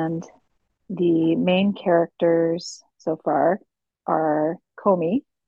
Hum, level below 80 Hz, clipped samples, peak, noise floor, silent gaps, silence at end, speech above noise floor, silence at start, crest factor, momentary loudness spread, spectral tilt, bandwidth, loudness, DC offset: none; -68 dBFS; under 0.1%; -6 dBFS; -71 dBFS; none; 0.3 s; 50 dB; 0 s; 16 dB; 11 LU; -7 dB/octave; 8 kHz; -22 LUFS; under 0.1%